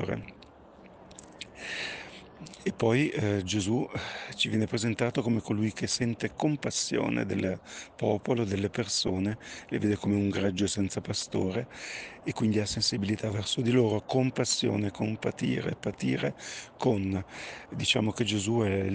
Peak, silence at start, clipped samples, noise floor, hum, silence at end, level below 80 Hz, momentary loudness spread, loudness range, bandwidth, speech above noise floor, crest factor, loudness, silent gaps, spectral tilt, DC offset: -12 dBFS; 0 s; under 0.1%; -53 dBFS; none; 0 s; -60 dBFS; 12 LU; 3 LU; 10 kHz; 23 dB; 18 dB; -30 LUFS; none; -5 dB/octave; under 0.1%